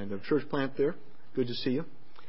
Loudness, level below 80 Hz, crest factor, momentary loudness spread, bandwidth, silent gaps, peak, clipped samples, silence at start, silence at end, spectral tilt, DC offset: -32 LUFS; -70 dBFS; 16 dB; 11 LU; 5.8 kHz; none; -16 dBFS; under 0.1%; 0 s; 0.4 s; -10 dB/octave; 2%